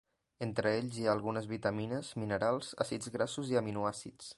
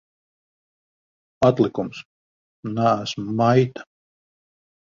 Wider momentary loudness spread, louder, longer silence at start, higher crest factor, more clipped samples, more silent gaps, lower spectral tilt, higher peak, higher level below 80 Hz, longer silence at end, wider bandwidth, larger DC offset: second, 5 LU vs 17 LU; second, -36 LUFS vs -21 LUFS; second, 0.4 s vs 1.4 s; about the same, 20 dB vs 22 dB; neither; second, none vs 2.05-2.63 s; second, -5.5 dB/octave vs -7 dB/octave; second, -16 dBFS vs -4 dBFS; second, -66 dBFS vs -58 dBFS; second, 0.05 s vs 1.05 s; first, 11.5 kHz vs 7.4 kHz; neither